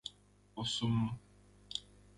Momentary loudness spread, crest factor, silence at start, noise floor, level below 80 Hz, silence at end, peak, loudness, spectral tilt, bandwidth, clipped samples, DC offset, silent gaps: 16 LU; 20 dB; 0.05 s; -64 dBFS; -62 dBFS; 0.35 s; -20 dBFS; -38 LUFS; -5 dB/octave; 11.5 kHz; under 0.1%; under 0.1%; none